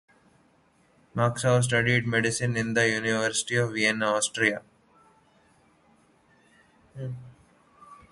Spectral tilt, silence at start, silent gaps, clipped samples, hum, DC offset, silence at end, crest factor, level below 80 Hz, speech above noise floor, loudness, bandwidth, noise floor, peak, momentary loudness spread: -4 dB/octave; 1.15 s; none; under 0.1%; none; under 0.1%; 0.15 s; 20 dB; -62 dBFS; 38 dB; -25 LUFS; 11.5 kHz; -63 dBFS; -8 dBFS; 15 LU